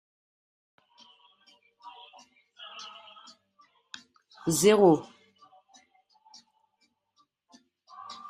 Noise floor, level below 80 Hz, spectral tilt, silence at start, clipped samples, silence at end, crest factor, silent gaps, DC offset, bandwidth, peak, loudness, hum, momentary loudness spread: -74 dBFS; -72 dBFS; -4.5 dB/octave; 1.85 s; under 0.1%; 0 s; 24 dB; none; under 0.1%; 13.5 kHz; -8 dBFS; -23 LUFS; none; 30 LU